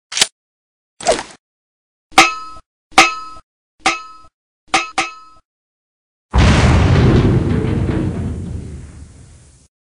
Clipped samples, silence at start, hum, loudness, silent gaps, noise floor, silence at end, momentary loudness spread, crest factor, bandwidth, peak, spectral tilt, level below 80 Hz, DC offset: under 0.1%; 0.1 s; none; -15 LUFS; 0.32-0.97 s, 1.39-2.10 s, 2.66-2.90 s, 3.43-3.78 s, 4.34-4.67 s, 5.45-6.29 s; -43 dBFS; 0.95 s; 18 LU; 18 dB; 11.5 kHz; 0 dBFS; -4.5 dB/octave; -26 dBFS; under 0.1%